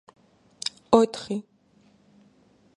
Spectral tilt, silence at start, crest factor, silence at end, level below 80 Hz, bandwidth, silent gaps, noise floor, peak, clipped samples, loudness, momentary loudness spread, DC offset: -5 dB/octave; 0.9 s; 26 dB; 1.35 s; -64 dBFS; 11.5 kHz; none; -60 dBFS; -2 dBFS; under 0.1%; -25 LUFS; 13 LU; under 0.1%